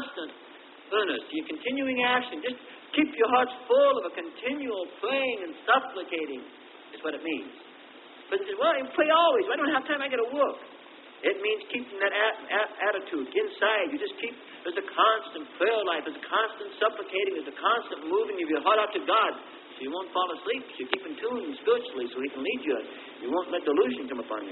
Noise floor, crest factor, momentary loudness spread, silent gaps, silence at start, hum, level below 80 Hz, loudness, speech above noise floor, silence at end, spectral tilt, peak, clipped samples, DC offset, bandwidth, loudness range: -49 dBFS; 24 dB; 15 LU; none; 0 s; none; -80 dBFS; -28 LUFS; 21 dB; 0 s; -7 dB/octave; -4 dBFS; under 0.1%; under 0.1%; 4.2 kHz; 4 LU